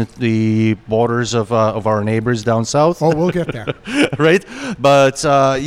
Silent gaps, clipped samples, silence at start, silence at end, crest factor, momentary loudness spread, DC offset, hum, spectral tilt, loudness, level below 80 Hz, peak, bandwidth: none; under 0.1%; 0 s; 0 s; 12 dB; 6 LU; under 0.1%; none; -5.5 dB/octave; -15 LUFS; -46 dBFS; -2 dBFS; 14.5 kHz